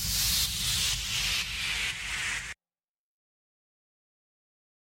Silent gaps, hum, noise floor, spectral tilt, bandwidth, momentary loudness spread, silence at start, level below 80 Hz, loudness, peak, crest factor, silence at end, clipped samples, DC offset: none; none; under -90 dBFS; 0 dB/octave; 16.5 kHz; 8 LU; 0 s; -46 dBFS; -28 LUFS; -14 dBFS; 20 dB; 2.4 s; under 0.1%; under 0.1%